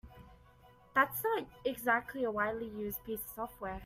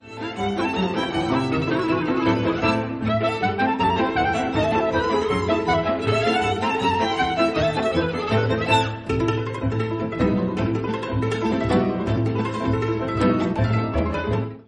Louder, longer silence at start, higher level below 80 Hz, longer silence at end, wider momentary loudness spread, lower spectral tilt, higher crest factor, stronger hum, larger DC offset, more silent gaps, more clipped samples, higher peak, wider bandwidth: second, -35 LUFS vs -22 LUFS; about the same, 0.05 s vs 0.05 s; second, -60 dBFS vs -40 dBFS; about the same, 0 s vs 0.05 s; first, 10 LU vs 4 LU; second, -4 dB/octave vs -6.5 dB/octave; first, 22 dB vs 16 dB; neither; neither; neither; neither; second, -14 dBFS vs -6 dBFS; first, 16 kHz vs 11 kHz